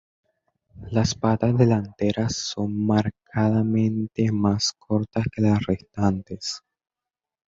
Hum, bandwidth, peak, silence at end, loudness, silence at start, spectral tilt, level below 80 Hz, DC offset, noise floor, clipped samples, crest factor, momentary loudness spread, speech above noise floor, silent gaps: none; 7.8 kHz; -6 dBFS; 0.9 s; -23 LUFS; 0.75 s; -6 dB/octave; -48 dBFS; under 0.1%; -89 dBFS; under 0.1%; 18 dB; 7 LU; 67 dB; none